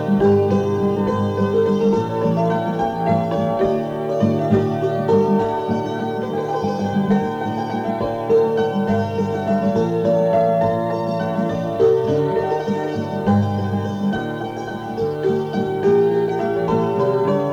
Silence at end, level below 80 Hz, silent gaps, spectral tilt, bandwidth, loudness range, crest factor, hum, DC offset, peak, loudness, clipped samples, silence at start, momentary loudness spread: 0 s; -50 dBFS; none; -8.5 dB/octave; 8.2 kHz; 2 LU; 12 dB; none; under 0.1%; -6 dBFS; -19 LUFS; under 0.1%; 0 s; 6 LU